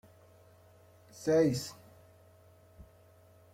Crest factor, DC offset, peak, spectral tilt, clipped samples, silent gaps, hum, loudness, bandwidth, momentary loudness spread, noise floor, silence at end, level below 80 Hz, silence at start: 20 dB; under 0.1%; -16 dBFS; -6 dB/octave; under 0.1%; none; none; -31 LUFS; 16 kHz; 28 LU; -61 dBFS; 0.7 s; -66 dBFS; 1.2 s